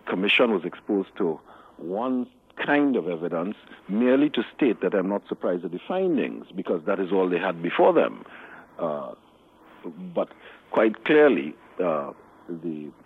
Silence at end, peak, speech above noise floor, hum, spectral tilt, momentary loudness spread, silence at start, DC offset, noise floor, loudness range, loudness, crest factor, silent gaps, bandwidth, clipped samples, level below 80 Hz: 0.15 s; -6 dBFS; 30 dB; none; -7.5 dB/octave; 18 LU; 0.05 s; under 0.1%; -54 dBFS; 3 LU; -25 LUFS; 18 dB; none; 4.5 kHz; under 0.1%; -72 dBFS